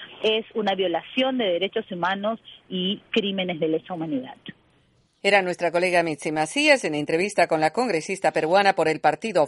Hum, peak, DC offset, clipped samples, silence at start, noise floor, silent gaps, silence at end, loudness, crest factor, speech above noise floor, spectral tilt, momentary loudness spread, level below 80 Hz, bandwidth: none; -2 dBFS; under 0.1%; under 0.1%; 0 s; -63 dBFS; none; 0 s; -23 LUFS; 22 dB; 40 dB; -4 dB/octave; 9 LU; -68 dBFS; 11.5 kHz